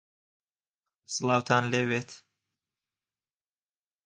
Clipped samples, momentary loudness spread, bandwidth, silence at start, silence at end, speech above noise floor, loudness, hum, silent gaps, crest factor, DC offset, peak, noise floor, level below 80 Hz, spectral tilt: under 0.1%; 11 LU; 10 kHz; 1.1 s; 1.9 s; over 62 dB; -28 LUFS; none; none; 24 dB; under 0.1%; -8 dBFS; under -90 dBFS; -72 dBFS; -4.5 dB/octave